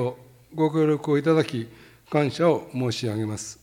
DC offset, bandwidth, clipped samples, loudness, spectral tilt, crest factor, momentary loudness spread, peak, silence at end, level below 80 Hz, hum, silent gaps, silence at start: under 0.1%; 16 kHz; under 0.1%; -24 LUFS; -6.5 dB/octave; 18 dB; 10 LU; -6 dBFS; 0.1 s; -64 dBFS; none; none; 0 s